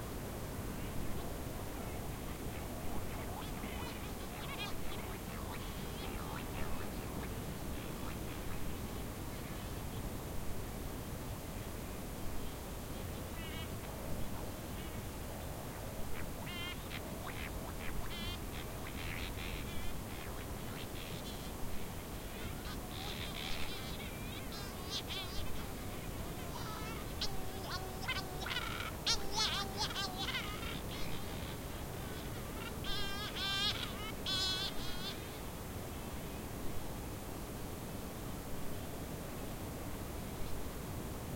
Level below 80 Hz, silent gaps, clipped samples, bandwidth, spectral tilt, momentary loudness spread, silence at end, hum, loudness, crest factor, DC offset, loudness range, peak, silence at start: -48 dBFS; none; under 0.1%; 16.5 kHz; -4 dB/octave; 7 LU; 0 s; none; -42 LUFS; 22 dB; under 0.1%; 7 LU; -18 dBFS; 0 s